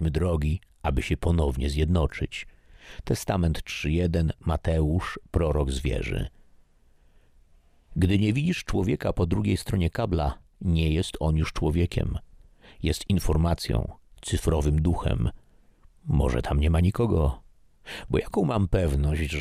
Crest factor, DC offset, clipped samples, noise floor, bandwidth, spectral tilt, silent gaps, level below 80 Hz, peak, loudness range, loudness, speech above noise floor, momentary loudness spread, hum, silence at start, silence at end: 18 dB; under 0.1%; under 0.1%; -59 dBFS; 14.5 kHz; -6.5 dB/octave; none; -32 dBFS; -8 dBFS; 3 LU; -26 LUFS; 34 dB; 8 LU; none; 0 s; 0 s